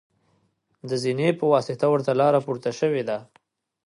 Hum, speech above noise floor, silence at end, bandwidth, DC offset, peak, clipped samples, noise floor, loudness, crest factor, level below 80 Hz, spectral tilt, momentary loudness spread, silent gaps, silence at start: none; 46 dB; 0.65 s; 11.5 kHz; under 0.1%; -6 dBFS; under 0.1%; -68 dBFS; -23 LUFS; 18 dB; -72 dBFS; -6.5 dB/octave; 10 LU; none; 0.85 s